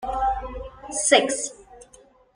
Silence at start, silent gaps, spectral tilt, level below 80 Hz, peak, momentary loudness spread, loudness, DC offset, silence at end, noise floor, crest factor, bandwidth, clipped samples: 0 s; none; -1.5 dB/octave; -42 dBFS; -2 dBFS; 17 LU; -22 LUFS; under 0.1%; 0.5 s; -54 dBFS; 24 dB; 10.5 kHz; under 0.1%